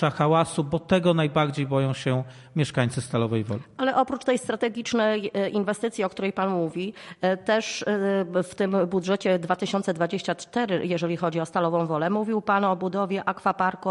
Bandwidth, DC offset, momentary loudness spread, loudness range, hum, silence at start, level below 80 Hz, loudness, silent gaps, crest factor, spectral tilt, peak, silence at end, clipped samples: 11.5 kHz; under 0.1%; 5 LU; 1 LU; none; 0 s; -60 dBFS; -25 LUFS; none; 18 dB; -6 dB/octave; -8 dBFS; 0 s; under 0.1%